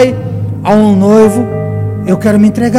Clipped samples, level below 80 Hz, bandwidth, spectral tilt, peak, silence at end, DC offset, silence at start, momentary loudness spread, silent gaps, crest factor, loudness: 2%; -40 dBFS; 14 kHz; -7.5 dB/octave; 0 dBFS; 0 s; under 0.1%; 0 s; 10 LU; none; 8 dB; -10 LUFS